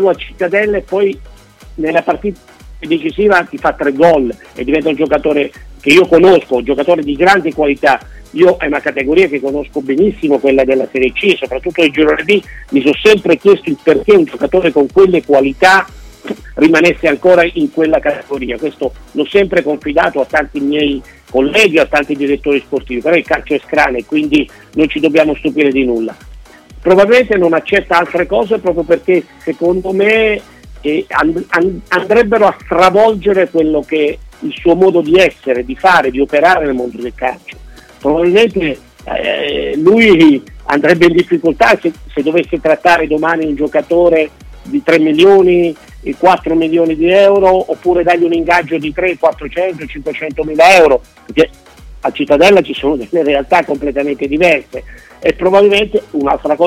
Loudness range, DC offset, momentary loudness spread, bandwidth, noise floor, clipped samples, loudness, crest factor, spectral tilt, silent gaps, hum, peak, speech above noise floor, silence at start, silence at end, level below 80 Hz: 3 LU; under 0.1%; 11 LU; 15 kHz; -35 dBFS; under 0.1%; -11 LUFS; 12 dB; -5.5 dB/octave; none; none; 0 dBFS; 24 dB; 0 s; 0 s; -36 dBFS